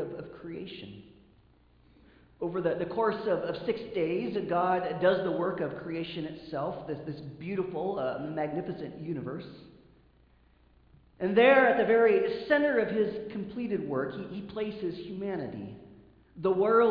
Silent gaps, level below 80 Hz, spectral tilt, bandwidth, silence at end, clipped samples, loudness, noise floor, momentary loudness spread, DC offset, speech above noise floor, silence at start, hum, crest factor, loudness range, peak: none; -64 dBFS; -4.5 dB/octave; 5.2 kHz; 0 s; under 0.1%; -30 LUFS; -62 dBFS; 17 LU; under 0.1%; 34 dB; 0 s; none; 20 dB; 10 LU; -10 dBFS